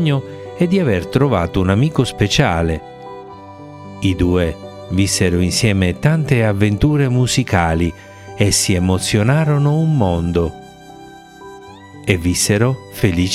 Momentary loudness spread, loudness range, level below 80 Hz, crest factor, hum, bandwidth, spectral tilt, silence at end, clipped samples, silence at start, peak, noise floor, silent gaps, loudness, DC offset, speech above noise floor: 19 LU; 3 LU; -36 dBFS; 16 dB; none; 15.5 kHz; -5.5 dB/octave; 0 s; under 0.1%; 0 s; 0 dBFS; -38 dBFS; none; -16 LUFS; under 0.1%; 23 dB